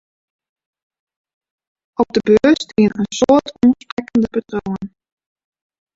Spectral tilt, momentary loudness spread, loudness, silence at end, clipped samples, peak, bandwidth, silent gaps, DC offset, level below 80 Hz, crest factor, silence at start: -5.5 dB/octave; 13 LU; -16 LUFS; 1.1 s; under 0.1%; -2 dBFS; 8 kHz; 3.92-3.97 s; under 0.1%; -50 dBFS; 18 dB; 2 s